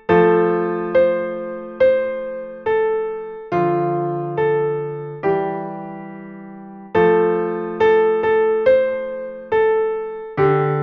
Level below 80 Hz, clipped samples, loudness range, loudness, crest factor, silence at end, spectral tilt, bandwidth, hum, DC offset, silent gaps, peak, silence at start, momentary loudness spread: -56 dBFS; under 0.1%; 4 LU; -19 LUFS; 16 dB; 0 s; -9 dB/octave; 5.2 kHz; none; under 0.1%; none; -2 dBFS; 0.1 s; 14 LU